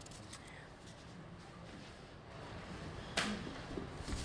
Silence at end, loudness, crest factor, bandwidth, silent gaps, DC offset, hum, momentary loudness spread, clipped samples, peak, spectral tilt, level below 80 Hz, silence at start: 0 s; -46 LUFS; 28 dB; 11 kHz; none; under 0.1%; none; 15 LU; under 0.1%; -18 dBFS; -4 dB/octave; -56 dBFS; 0 s